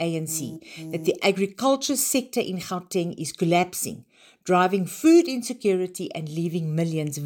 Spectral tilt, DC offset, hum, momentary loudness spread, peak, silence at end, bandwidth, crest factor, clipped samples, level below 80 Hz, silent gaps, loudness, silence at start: -4.5 dB/octave; under 0.1%; none; 12 LU; -6 dBFS; 0 s; 17 kHz; 18 dB; under 0.1%; -70 dBFS; none; -24 LUFS; 0 s